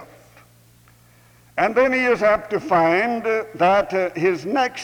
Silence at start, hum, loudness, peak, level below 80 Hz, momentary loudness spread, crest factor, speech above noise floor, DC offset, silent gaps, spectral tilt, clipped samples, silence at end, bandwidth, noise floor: 0 s; none; -19 LUFS; -4 dBFS; -56 dBFS; 5 LU; 16 dB; 33 dB; under 0.1%; none; -5.5 dB/octave; under 0.1%; 0 s; 19.5 kHz; -52 dBFS